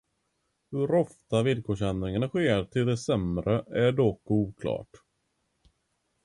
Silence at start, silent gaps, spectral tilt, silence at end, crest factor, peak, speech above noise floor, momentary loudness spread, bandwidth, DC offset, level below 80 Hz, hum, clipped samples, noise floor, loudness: 0.7 s; none; -7 dB/octave; 1.4 s; 18 dB; -12 dBFS; 50 dB; 6 LU; 11.5 kHz; under 0.1%; -50 dBFS; none; under 0.1%; -77 dBFS; -28 LUFS